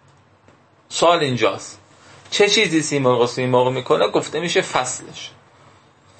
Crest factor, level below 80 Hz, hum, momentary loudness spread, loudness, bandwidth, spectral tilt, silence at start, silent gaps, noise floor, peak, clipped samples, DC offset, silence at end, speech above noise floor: 18 dB; -64 dBFS; none; 16 LU; -18 LUFS; 8.8 kHz; -3.5 dB/octave; 0.9 s; none; -53 dBFS; -2 dBFS; under 0.1%; under 0.1%; 0.9 s; 35 dB